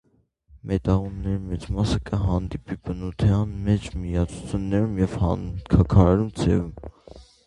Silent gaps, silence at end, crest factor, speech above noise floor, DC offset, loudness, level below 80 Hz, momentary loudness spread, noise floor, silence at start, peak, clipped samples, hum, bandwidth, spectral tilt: none; 0.25 s; 22 dB; 37 dB; under 0.1%; -24 LUFS; -32 dBFS; 13 LU; -60 dBFS; 0.55 s; -2 dBFS; under 0.1%; none; 10.5 kHz; -8 dB/octave